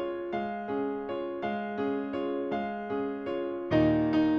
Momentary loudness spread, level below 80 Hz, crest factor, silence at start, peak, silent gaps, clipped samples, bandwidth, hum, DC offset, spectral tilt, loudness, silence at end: 8 LU; -56 dBFS; 16 dB; 0 s; -14 dBFS; none; under 0.1%; 6.2 kHz; none; under 0.1%; -8.5 dB/octave; -31 LUFS; 0 s